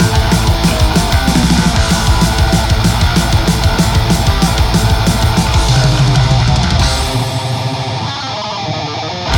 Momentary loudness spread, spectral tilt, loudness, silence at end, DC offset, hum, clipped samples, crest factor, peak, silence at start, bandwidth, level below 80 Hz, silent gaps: 7 LU; -5 dB/octave; -12 LUFS; 0 s; under 0.1%; none; under 0.1%; 12 dB; 0 dBFS; 0 s; 19.5 kHz; -18 dBFS; none